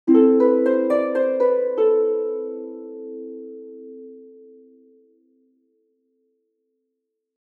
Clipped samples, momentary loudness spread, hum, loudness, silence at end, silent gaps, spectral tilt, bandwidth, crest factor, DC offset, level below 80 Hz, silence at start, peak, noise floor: under 0.1%; 24 LU; none; -19 LUFS; 3.2 s; none; -7.5 dB/octave; 4.4 kHz; 18 dB; under 0.1%; -86 dBFS; 0.05 s; -4 dBFS; -79 dBFS